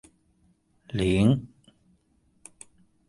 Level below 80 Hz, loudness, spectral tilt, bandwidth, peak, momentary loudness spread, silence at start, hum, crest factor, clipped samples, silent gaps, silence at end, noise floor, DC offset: -48 dBFS; -25 LUFS; -7 dB/octave; 11.5 kHz; -8 dBFS; 26 LU; 0.95 s; none; 22 dB; under 0.1%; none; 1.6 s; -66 dBFS; under 0.1%